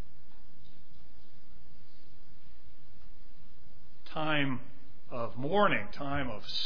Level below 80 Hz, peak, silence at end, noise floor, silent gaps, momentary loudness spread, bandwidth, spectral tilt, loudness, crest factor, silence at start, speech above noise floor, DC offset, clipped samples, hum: -58 dBFS; -12 dBFS; 0 s; -60 dBFS; none; 15 LU; 5.4 kHz; -6.5 dB/octave; -33 LUFS; 24 dB; 0.55 s; 27 dB; 4%; under 0.1%; none